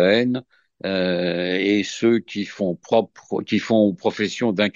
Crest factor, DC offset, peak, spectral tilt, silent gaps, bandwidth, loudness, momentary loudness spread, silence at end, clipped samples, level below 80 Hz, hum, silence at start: 18 dB; under 0.1%; -4 dBFS; -5.5 dB/octave; none; 7.6 kHz; -21 LUFS; 9 LU; 0.05 s; under 0.1%; -64 dBFS; none; 0 s